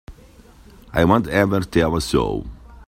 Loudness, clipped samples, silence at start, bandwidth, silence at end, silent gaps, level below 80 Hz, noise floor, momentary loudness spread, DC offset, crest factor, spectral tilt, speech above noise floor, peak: -19 LUFS; under 0.1%; 0.1 s; 16.5 kHz; 0.05 s; none; -36 dBFS; -47 dBFS; 10 LU; under 0.1%; 18 dB; -6 dB/octave; 28 dB; -2 dBFS